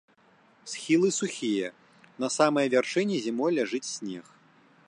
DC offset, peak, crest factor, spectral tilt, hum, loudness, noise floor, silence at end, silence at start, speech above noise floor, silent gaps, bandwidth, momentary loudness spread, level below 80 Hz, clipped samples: under 0.1%; -10 dBFS; 20 dB; -4 dB/octave; none; -27 LUFS; -61 dBFS; 0.65 s; 0.65 s; 34 dB; none; 11 kHz; 14 LU; -80 dBFS; under 0.1%